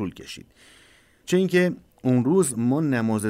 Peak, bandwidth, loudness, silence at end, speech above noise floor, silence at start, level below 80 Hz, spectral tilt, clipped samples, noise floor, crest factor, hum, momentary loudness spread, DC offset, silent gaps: -10 dBFS; 16 kHz; -22 LUFS; 0 s; 33 dB; 0 s; -62 dBFS; -6 dB/octave; under 0.1%; -56 dBFS; 14 dB; none; 19 LU; under 0.1%; none